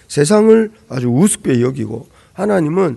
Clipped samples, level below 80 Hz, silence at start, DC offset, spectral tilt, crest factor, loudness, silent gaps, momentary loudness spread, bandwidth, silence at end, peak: 0.1%; -52 dBFS; 0.1 s; under 0.1%; -6 dB/octave; 14 dB; -14 LUFS; none; 13 LU; 12.5 kHz; 0 s; 0 dBFS